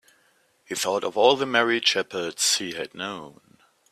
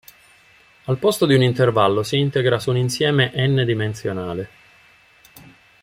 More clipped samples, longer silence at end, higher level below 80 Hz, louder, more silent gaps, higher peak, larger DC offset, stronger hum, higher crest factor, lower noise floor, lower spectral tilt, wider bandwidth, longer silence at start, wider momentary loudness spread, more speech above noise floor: neither; first, 0.65 s vs 0.45 s; second, -72 dBFS vs -56 dBFS; second, -23 LUFS vs -19 LUFS; neither; about the same, -4 dBFS vs -2 dBFS; neither; neither; about the same, 22 dB vs 18 dB; first, -64 dBFS vs -52 dBFS; second, -1.5 dB/octave vs -6 dB/octave; about the same, 15.5 kHz vs 16 kHz; second, 0.7 s vs 0.85 s; about the same, 13 LU vs 11 LU; first, 40 dB vs 34 dB